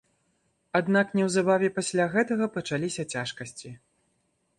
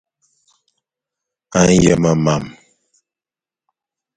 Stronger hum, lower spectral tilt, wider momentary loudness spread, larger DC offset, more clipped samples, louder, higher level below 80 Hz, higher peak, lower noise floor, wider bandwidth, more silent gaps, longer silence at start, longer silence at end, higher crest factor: neither; about the same, -5 dB/octave vs -5.5 dB/octave; first, 15 LU vs 11 LU; neither; neither; second, -26 LUFS vs -14 LUFS; second, -68 dBFS vs -42 dBFS; second, -10 dBFS vs 0 dBFS; second, -73 dBFS vs under -90 dBFS; first, 11.5 kHz vs 9.4 kHz; neither; second, 0.75 s vs 1.5 s; second, 0.85 s vs 1.65 s; about the same, 18 dB vs 18 dB